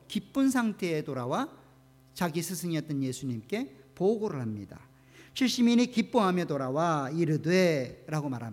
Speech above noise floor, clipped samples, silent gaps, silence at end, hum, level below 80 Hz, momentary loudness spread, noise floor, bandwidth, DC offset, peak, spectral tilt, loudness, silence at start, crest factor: 30 dB; under 0.1%; none; 0 s; none; -68 dBFS; 11 LU; -58 dBFS; 16.5 kHz; under 0.1%; -12 dBFS; -5.5 dB/octave; -29 LUFS; 0.1 s; 18 dB